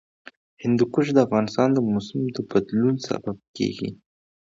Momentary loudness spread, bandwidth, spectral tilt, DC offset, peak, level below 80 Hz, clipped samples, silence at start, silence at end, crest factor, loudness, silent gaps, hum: 10 LU; 7.6 kHz; -7 dB/octave; under 0.1%; -4 dBFS; -60 dBFS; under 0.1%; 0.6 s; 0.45 s; 20 dB; -23 LUFS; 3.48-3.54 s; none